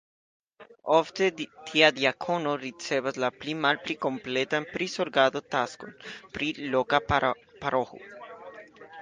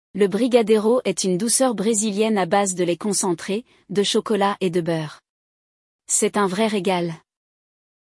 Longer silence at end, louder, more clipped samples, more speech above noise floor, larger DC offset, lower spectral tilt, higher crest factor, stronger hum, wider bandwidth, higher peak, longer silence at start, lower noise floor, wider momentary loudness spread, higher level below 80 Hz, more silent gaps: second, 0 s vs 0.9 s; second, -27 LUFS vs -20 LUFS; neither; second, 20 dB vs over 70 dB; neither; about the same, -4 dB/octave vs -4 dB/octave; first, 24 dB vs 18 dB; neither; second, 9.8 kHz vs 12 kHz; about the same, -4 dBFS vs -4 dBFS; first, 0.6 s vs 0.15 s; second, -47 dBFS vs under -90 dBFS; first, 19 LU vs 9 LU; first, -56 dBFS vs -68 dBFS; second, none vs 5.29-5.99 s